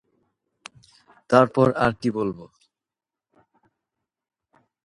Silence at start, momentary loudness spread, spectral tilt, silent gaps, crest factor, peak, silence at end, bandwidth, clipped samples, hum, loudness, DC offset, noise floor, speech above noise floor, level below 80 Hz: 1.3 s; 12 LU; -7 dB/octave; none; 26 dB; -2 dBFS; 2.4 s; 11.5 kHz; under 0.1%; none; -21 LUFS; under 0.1%; -89 dBFS; 69 dB; -58 dBFS